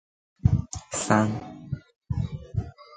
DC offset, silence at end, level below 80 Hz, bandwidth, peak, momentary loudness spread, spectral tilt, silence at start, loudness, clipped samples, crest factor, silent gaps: under 0.1%; 0 s; -40 dBFS; 9.4 kHz; -4 dBFS; 14 LU; -6 dB/octave; 0.45 s; -28 LUFS; under 0.1%; 24 dB; 1.96-2.01 s